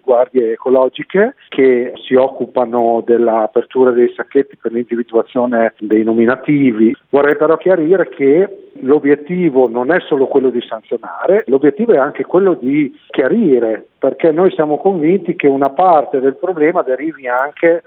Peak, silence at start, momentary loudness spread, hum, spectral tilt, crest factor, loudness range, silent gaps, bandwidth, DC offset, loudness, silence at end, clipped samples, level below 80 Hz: 0 dBFS; 0.05 s; 6 LU; none; -10 dB/octave; 12 dB; 2 LU; none; 4.1 kHz; under 0.1%; -13 LUFS; 0.05 s; under 0.1%; -64 dBFS